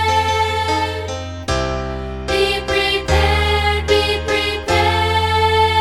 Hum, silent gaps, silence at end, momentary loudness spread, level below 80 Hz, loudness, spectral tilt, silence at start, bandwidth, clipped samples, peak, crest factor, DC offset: none; none; 0 s; 9 LU; -26 dBFS; -17 LUFS; -4.5 dB/octave; 0 s; 15 kHz; under 0.1%; -2 dBFS; 16 dB; under 0.1%